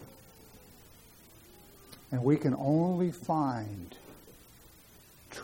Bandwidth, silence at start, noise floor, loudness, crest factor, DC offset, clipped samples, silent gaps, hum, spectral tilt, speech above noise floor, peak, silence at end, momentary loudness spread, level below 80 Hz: 17 kHz; 0 s; -57 dBFS; -30 LUFS; 20 dB; under 0.1%; under 0.1%; none; none; -8 dB/octave; 27 dB; -14 dBFS; 0 s; 26 LU; -64 dBFS